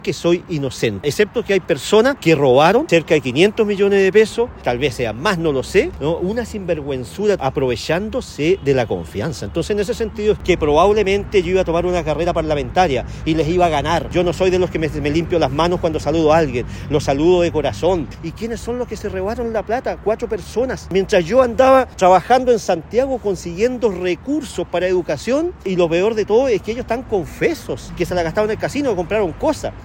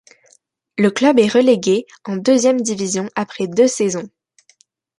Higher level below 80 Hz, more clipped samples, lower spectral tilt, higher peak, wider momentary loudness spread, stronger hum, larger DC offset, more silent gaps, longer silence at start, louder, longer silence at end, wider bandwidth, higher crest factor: first, -36 dBFS vs -64 dBFS; neither; about the same, -5.5 dB/octave vs -4.5 dB/octave; about the same, 0 dBFS vs -2 dBFS; second, 9 LU vs 12 LU; neither; neither; neither; second, 0 s vs 0.75 s; about the same, -17 LUFS vs -16 LUFS; second, 0 s vs 0.9 s; first, 16.5 kHz vs 11.5 kHz; about the same, 16 dB vs 16 dB